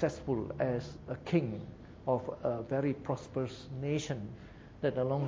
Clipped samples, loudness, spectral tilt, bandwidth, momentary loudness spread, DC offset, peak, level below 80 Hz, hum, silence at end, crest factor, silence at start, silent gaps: under 0.1%; -36 LUFS; -7 dB/octave; 8 kHz; 10 LU; under 0.1%; -16 dBFS; -58 dBFS; none; 0 s; 18 dB; 0 s; none